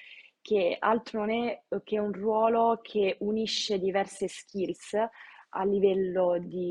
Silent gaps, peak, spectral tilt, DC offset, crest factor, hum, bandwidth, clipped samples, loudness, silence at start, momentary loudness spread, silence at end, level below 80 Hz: none; -12 dBFS; -5 dB/octave; under 0.1%; 18 dB; none; 11 kHz; under 0.1%; -29 LUFS; 0 s; 9 LU; 0 s; -68 dBFS